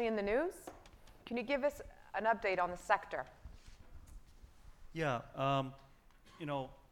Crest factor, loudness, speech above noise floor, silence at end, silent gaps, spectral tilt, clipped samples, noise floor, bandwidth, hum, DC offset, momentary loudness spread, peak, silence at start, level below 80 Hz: 24 dB; -38 LUFS; 25 dB; 0.15 s; none; -6 dB/octave; under 0.1%; -62 dBFS; 17.5 kHz; none; under 0.1%; 22 LU; -16 dBFS; 0 s; -60 dBFS